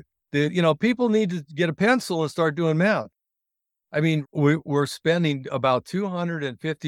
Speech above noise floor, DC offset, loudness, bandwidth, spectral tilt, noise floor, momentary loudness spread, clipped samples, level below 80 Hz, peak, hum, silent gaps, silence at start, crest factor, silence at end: 62 dB; under 0.1%; -23 LUFS; 14.5 kHz; -6.5 dB/octave; -84 dBFS; 7 LU; under 0.1%; -66 dBFS; -6 dBFS; none; none; 0.35 s; 18 dB; 0 s